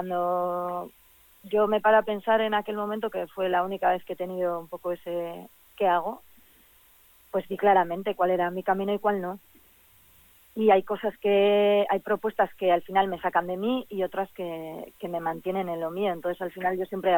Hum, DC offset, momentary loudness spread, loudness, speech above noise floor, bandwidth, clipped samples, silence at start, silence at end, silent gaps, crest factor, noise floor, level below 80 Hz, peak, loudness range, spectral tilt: none; under 0.1%; 12 LU; -27 LUFS; 32 dB; 17.5 kHz; under 0.1%; 0 s; 0 s; none; 18 dB; -58 dBFS; -66 dBFS; -10 dBFS; 6 LU; -6.5 dB/octave